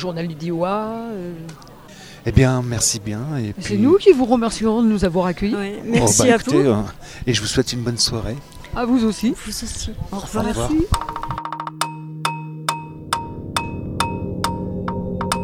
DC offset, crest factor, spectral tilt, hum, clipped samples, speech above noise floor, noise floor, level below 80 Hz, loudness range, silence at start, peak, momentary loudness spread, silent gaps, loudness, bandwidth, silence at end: under 0.1%; 20 dB; -4.5 dB/octave; none; under 0.1%; 21 dB; -40 dBFS; -36 dBFS; 8 LU; 0 s; 0 dBFS; 13 LU; none; -20 LUFS; 17 kHz; 0 s